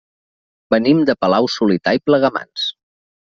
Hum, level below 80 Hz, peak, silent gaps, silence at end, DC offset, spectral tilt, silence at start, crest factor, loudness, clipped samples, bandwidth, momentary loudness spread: none; -56 dBFS; -2 dBFS; none; 0.55 s; under 0.1%; -6 dB/octave; 0.7 s; 16 dB; -16 LUFS; under 0.1%; 7.4 kHz; 8 LU